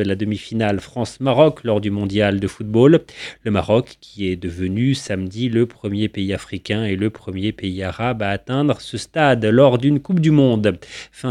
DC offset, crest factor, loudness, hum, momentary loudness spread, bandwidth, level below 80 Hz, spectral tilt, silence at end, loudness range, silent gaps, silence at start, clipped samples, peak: under 0.1%; 18 dB; -19 LUFS; none; 11 LU; 11.5 kHz; -48 dBFS; -7 dB/octave; 0 s; 5 LU; none; 0 s; under 0.1%; 0 dBFS